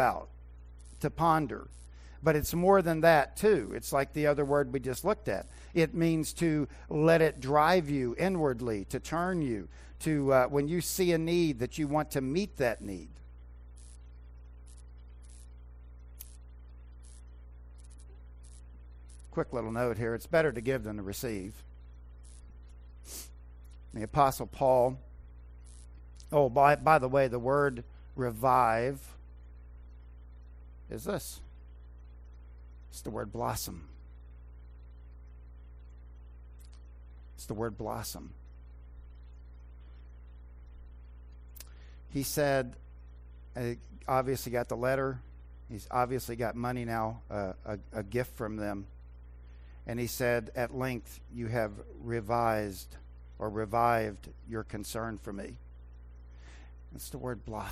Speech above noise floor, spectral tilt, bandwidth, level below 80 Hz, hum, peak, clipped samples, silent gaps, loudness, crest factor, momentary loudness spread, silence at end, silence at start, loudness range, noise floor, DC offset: 19 dB; -6 dB/octave; 16 kHz; -50 dBFS; 60 Hz at -50 dBFS; -10 dBFS; under 0.1%; none; -31 LUFS; 24 dB; 26 LU; 0 s; 0 s; 21 LU; -50 dBFS; under 0.1%